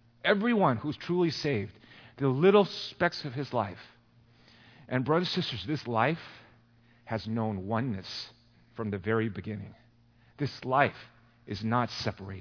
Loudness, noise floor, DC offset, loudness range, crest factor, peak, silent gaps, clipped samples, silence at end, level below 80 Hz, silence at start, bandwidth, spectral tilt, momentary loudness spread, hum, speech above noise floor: -30 LUFS; -62 dBFS; under 0.1%; 6 LU; 22 dB; -8 dBFS; none; under 0.1%; 0 s; -66 dBFS; 0.25 s; 5.4 kHz; -6.5 dB/octave; 14 LU; none; 33 dB